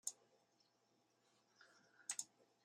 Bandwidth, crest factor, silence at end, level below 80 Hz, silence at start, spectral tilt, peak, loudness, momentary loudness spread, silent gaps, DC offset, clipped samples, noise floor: 14.5 kHz; 32 dB; 0.4 s; under -90 dBFS; 0.05 s; 2 dB/octave; -26 dBFS; -50 LUFS; 21 LU; none; under 0.1%; under 0.1%; -81 dBFS